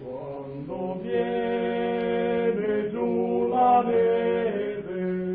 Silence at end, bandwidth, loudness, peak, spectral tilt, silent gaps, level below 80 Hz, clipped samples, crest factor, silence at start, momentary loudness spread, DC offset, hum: 0 s; 4.1 kHz; -25 LUFS; -10 dBFS; -10.5 dB/octave; none; -58 dBFS; under 0.1%; 14 dB; 0 s; 12 LU; under 0.1%; none